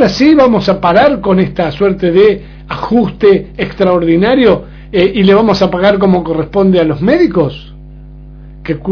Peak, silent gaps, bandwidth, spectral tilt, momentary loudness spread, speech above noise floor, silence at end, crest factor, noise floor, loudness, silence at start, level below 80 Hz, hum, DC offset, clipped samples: 0 dBFS; none; 5.4 kHz; -7.5 dB/octave; 10 LU; 22 dB; 0 s; 10 dB; -31 dBFS; -10 LUFS; 0 s; -32 dBFS; none; under 0.1%; 0.7%